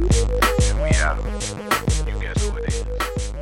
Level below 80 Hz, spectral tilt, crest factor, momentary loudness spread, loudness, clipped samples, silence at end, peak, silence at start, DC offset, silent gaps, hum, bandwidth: -22 dBFS; -4.5 dB/octave; 16 dB; 8 LU; -22 LUFS; under 0.1%; 0 s; -4 dBFS; 0 s; under 0.1%; none; none; 17 kHz